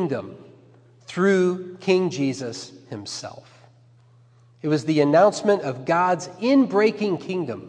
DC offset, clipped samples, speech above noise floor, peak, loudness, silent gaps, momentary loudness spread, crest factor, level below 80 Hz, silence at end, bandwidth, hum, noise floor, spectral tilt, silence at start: under 0.1%; under 0.1%; 32 dB; -4 dBFS; -22 LUFS; none; 16 LU; 18 dB; -74 dBFS; 0 s; 10 kHz; none; -54 dBFS; -6 dB/octave; 0 s